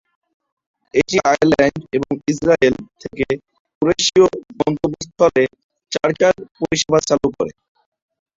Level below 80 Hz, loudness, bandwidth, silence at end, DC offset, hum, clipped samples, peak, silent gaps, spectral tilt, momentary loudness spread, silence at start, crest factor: -48 dBFS; -17 LUFS; 7.8 kHz; 0.85 s; under 0.1%; none; under 0.1%; -2 dBFS; 3.60-3.65 s, 3.75-3.81 s, 5.64-5.69 s; -4.5 dB/octave; 10 LU; 0.95 s; 16 dB